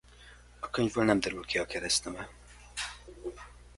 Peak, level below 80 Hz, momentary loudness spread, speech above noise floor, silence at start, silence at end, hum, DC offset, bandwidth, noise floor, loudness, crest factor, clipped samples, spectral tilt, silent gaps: -10 dBFS; -54 dBFS; 16 LU; 24 dB; 0.1 s; 0.1 s; 60 Hz at -55 dBFS; under 0.1%; 11.5 kHz; -54 dBFS; -31 LUFS; 24 dB; under 0.1%; -3.5 dB/octave; none